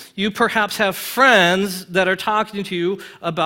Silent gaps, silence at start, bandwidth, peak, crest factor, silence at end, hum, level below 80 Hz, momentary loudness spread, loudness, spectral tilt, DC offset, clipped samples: none; 0 s; 17 kHz; 0 dBFS; 18 dB; 0 s; none; -58 dBFS; 11 LU; -18 LUFS; -4 dB/octave; under 0.1%; under 0.1%